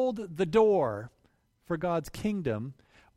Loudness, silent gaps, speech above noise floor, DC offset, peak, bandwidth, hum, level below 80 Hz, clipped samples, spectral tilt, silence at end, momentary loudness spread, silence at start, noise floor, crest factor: -29 LUFS; none; 40 dB; under 0.1%; -12 dBFS; 15.5 kHz; none; -58 dBFS; under 0.1%; -7 dB/octave; 0.45 s; 16 LU; 0 s; -69 dBFS; 18 dB